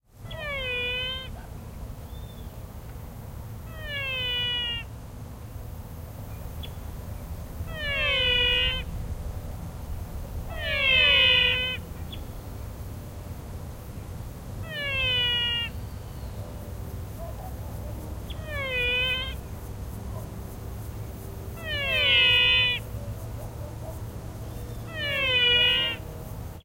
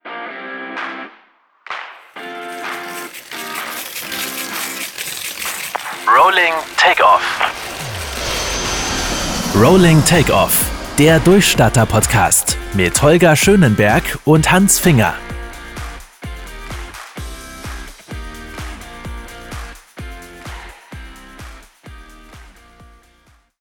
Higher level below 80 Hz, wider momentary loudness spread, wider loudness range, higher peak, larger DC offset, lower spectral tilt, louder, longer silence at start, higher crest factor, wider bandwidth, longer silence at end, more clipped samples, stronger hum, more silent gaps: second, -40 dBFS vs -34 dBFS; about the same, 21 LU vs 22 LU; second, 11 LU vs 20 LU; second, -8 dBFS vs -2 dBFS; neither; about the same, -3.5 dB/octave vs -4 dB/octave; second, -23 LUFS vs -14 LUFS; about the same, 0.15 s vs 0.05 s; first, 22 dB vs 16 dB; second, 16 kHz vs over 20 kHz; second, 0 s vs 1.1 s; neither; neither; neither